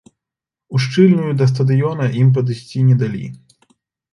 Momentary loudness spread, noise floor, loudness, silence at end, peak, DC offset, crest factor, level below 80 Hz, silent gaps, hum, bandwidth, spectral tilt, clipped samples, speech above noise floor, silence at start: 10 LU; -86 dBFS; -16 LUFS; 0.75 s; 0 dBFS; under 0.1%; 16 dB; -56 dBFS; none; none; 11 kHz; -8 dB/octave; under 0.1%; 72 dB; 0.7 s